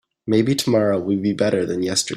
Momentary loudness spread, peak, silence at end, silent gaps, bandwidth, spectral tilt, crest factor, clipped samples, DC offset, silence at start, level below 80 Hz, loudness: 3 LU; -4 dBFS; 0 s; none; 15 kHz; -5 dB/octave; 14 dB; under 0.1%; under 0.1%; 0.25 s; -56 dBFS; -20 LUFS